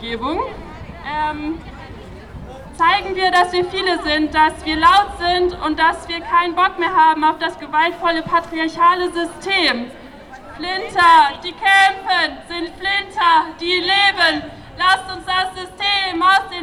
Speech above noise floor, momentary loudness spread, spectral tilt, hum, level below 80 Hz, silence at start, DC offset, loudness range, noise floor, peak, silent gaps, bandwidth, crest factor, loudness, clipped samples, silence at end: 20 dB; 16 LU; -3 dB/octave; none; -42 dBFS; 0 s; under 0.1%; 4 LU; -37 dBFS; -2 dBFS; none; 13.5 kHz; 16 dB; -16 LUFS; under 0.1%; 0 s